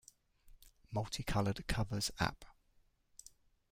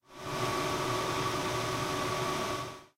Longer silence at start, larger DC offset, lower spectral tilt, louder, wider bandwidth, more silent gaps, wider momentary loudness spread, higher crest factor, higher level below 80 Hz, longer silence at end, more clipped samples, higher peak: first, 0.45 s vs 0.1 s; neither; about the same, -4.5 dB/octave vs -4 dB/octave; second, -39 LUFS vs -33 LUFS; about the same, 16.5 kHz vs 16 kHz; neither; first, 21 LU vs 4 LU; first, 22 dB vs 14 dB; about the same, -52 dBFS vs -56 dBFS; first, 1.2 s vs 0.1 s; neither; about the same, -18 dBFS vs -20 dBFS